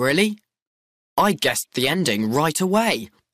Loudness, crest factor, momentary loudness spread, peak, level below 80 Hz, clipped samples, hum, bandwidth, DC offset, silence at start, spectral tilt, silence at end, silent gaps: -21 LUFS; 14 dB; 6 LU; -8 dBFS; -58 dBFS; under 0.1%; none; 15.5 kHz; under 0.1%; 0 s; -4 dB/octave; 0.25 s; 0.62-1.16 s